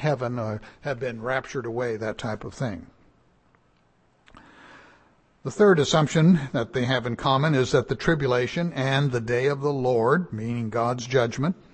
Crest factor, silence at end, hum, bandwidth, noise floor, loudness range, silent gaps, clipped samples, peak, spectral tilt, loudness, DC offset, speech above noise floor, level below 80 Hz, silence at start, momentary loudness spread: 18 dB; 0.2 s; none; 8.8 kHz; -63 dBFS; 12 LU; none; under 0.1%; -6 dBFS; -6 dB/octave; -24 LUFS; under 0.1%; 40 dB; -52 dBFS; 0 s; 13 LU